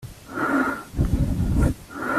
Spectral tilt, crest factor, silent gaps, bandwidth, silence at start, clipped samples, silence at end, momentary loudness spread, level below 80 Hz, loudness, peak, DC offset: -7.5 dB/octave; 16 dB; none; 14.5 kHz; 0 s; under 0.1%; 0 s; 6 LU; -30 dBFS; -24 LUFS; -6 dBFS; under 0.1%